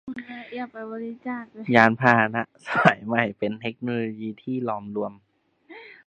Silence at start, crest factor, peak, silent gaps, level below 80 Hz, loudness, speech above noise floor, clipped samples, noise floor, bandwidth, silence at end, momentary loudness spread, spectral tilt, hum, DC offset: 0.05 s; 24 dB; 0 dBFS; none; -66 dBFS; -24 LUFS; 27 dB; under 0.1%; -51 dBFS; 9 kHz; 0.15 s; 17 LU; -7 dB/octave; none; under 0.1%